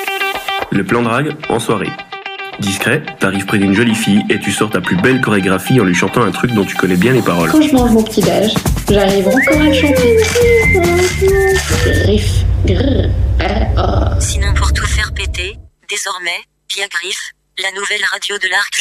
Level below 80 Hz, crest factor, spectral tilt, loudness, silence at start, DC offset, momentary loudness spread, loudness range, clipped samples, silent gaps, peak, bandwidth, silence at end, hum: -22 dBFS; 12 dB; -5 dB/octave; -13 LUFS; 0 s; under 0.1%; 9 LU; 6 LU; under 0.1%; none; 0 dBFS; 16 kHz; 0 s; none